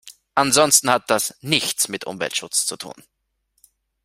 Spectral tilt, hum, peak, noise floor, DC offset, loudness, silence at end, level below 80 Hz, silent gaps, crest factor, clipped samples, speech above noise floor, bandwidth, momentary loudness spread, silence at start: -1.5 dB/octave; none; 0 dBFS; -70 dBFS; under 0.1%; -19 LUFS; 1.15 s; -62 dBFS; none; 22 dB; under 0.1%; 50 dB; 16 kHz; 12 LU; 0.05 s